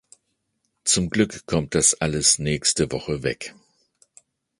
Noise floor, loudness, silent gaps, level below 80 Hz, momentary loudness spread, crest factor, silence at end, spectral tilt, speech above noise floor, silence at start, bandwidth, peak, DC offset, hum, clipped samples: -74 dBFS; -21 LUFS; none; -46 dBFS; 9 LU; 22 dB; 1.1 s; -3 dB/octave; 52 dB; 0.85 s; 11.5 kHz; -2 dBFS; under 0.1%; none; under 0.1%